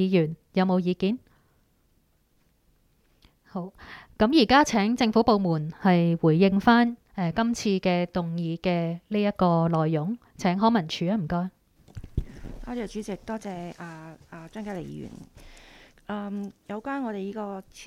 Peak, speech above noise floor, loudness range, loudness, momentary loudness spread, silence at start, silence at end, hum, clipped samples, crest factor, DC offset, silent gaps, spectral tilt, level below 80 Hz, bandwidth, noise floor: -4 dBFS; 41 dB; 15 LU; -25 LUFS; 19 LU; 0 s; 0 s; none; under 0.1%; 22 dB; under 0.1%; none; -6.5 dB/octave; -50 dBFS; 12.5 kHz; -66 dBFS